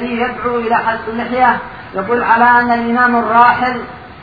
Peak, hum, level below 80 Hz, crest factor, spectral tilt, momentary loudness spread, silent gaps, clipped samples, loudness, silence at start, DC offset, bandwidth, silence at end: 0 dBFS; none; -44 dBFS; 14 dB; -7.5 dB/octave; 12 LU; none; under 0.1%; -13 LUFS; 0 s; 0.3%; 5 kHz; 0 s